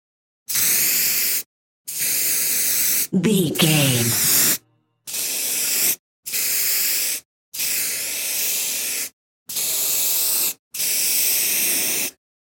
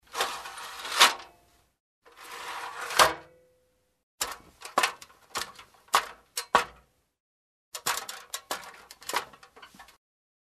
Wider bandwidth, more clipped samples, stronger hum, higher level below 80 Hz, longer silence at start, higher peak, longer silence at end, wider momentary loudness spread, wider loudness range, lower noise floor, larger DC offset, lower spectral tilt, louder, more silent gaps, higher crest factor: first, 17 kHz vs 14 kHz; neither; neither; about the same, -64 dBFS vs -64 dBFS; first, 0.5 s vs 0.1 s; about the same, -4 dBFS vs -2 dBFS; second, 0.35 s vs 0.75 s; second, 10 LU vs 20 LU; second, 3 LU vs 9 LU; second, -58 dBFS vs -71 dBFS; neither; first, -2 dB/octave vs 0.5 dB/octave; first, -18 LUFS vs -28 LUFS; first, 1.46-1.85 s, 5.99-6.23 s, 7.25-7.52 s, 9.13-9.46 s, 10.59-10.71 s vs 1.80-2.02 s, 4.03-4.18 s, 7.20-7.72 s; second, 18 dB vs 30 dB